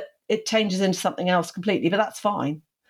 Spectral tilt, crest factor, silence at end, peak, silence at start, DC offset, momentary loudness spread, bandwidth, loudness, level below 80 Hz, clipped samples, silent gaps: -4.5 dB/octave; 16 dB; 0.3 s; -8 dBFS; 0 s; under 0.1%; 6 LU; 15 kHz; -24 LUFS; -74 dBFS; under 0.1%; none